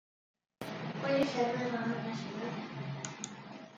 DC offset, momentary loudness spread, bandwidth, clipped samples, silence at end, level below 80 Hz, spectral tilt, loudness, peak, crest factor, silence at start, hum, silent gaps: under 0.1%; 13 LU; 11.5 kHz; under 0.1%; 0 s; -76 dBFS; -5 dB/octave; -36 LUFS; -18 dBFS; 18 dB; 0.6 s; none; none